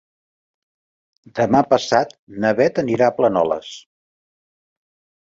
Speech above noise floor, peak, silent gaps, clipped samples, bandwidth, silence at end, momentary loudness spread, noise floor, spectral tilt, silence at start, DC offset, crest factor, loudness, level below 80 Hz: over 72 dB; -2 dBFS; 2.19-2.27 s; under 0.1%; 7.8 kHz; 1.4 s; 13 LU; under -90 dBFS; -5.5 dB/octave; 1.35 s; under 0.1%; 20 dB; -18 LUFS; -58 dBFS